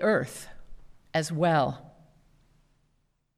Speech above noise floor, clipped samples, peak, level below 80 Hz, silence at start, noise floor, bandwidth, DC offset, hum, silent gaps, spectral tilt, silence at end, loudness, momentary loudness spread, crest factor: 45 dB; under 0.1%; -12 dBFS; -56 dBFS; 0 s; -72 dBFS; 15 kHz; under 0.1%; none; none; -5.5 dB/octave; 1.5 s; -28 LUFS; 19 LU; 18 dB